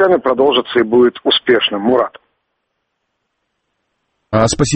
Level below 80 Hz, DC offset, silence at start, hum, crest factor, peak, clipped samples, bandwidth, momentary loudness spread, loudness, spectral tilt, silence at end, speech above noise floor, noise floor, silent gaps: -42 dBFS; under 0.1%; 0 s; none; 16 dB; 0 dBFS; under 0.1%; 8.8 kHz; 4 LU; -13 LUFS; -4.5 dB/octave; 0 s; 58 dB; -71 dBFS; none